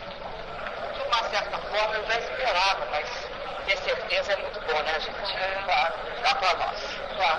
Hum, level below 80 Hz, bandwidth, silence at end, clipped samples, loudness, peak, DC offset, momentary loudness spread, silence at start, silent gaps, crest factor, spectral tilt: none; -48 dBFS; 10.5 kHz; 0 s; under 0.1%; -27 LUFS; -10 dBFS; under 0.1%; 10 LU; 0 s; none; 18 dB; -2 dB/octave